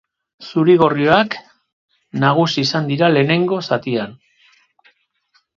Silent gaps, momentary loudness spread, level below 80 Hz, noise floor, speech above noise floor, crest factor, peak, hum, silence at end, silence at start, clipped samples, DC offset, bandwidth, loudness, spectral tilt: 1.73-1.88 s; 14 LU; -58 dBFS; -62 dBFS; 47 dB; 18 dB; 0 dBFS; none; 1.45 s; 0.4 s; under 0.1%; under 0.1%; 7.4 kHz; -16 LUFS; -6.5 dB/octave